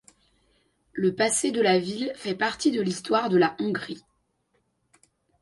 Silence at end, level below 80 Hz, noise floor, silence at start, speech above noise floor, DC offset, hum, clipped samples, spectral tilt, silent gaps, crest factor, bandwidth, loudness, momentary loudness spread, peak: 1.45 s; -66 dBFS; -72 dBFS; 0.95 s; 47 dB; under 0.1%; none; under 0.1%; -4 dB/octave; none; 18 dB; 11.5 kHz; -25 LUFS; 10 LU; -8 dBFS